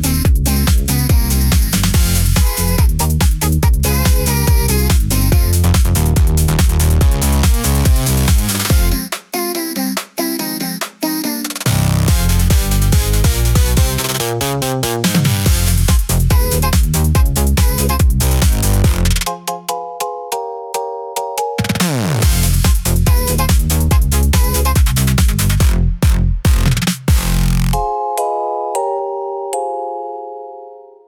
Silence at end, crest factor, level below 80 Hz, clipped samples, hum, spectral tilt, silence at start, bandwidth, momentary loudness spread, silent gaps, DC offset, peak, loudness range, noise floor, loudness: 0.25 s; 12 dB; -16 dBFS; under 0.1%; none; -4.5 dB/octave; 0 s; 18.5 kHz; 8 LU; none; under 0.1%; -2 dBFS; 5 LU; -36 dBFS; -15 LUFS